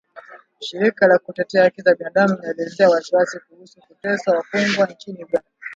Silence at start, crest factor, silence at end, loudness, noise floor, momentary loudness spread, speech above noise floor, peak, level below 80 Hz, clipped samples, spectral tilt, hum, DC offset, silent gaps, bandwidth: 0.15 s; 18 dB; 0 s; -18 LUFS; -43 dBFS; 12 LU; 24 dB; 0 dBFS; -68 dBFS; under 0.1%; -5 dB/octave; none; under 0.1%; none; 7.8 kHz